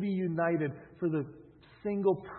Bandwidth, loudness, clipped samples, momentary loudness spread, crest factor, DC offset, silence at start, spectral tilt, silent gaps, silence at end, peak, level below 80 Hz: 4.3 kHz; -33 LUFS; under 0.1%; 8 LU; 16 dB; under 0.1%; 0 s; -8 dB/octave; none; 0 s; -16 dBFS; -68 dBFS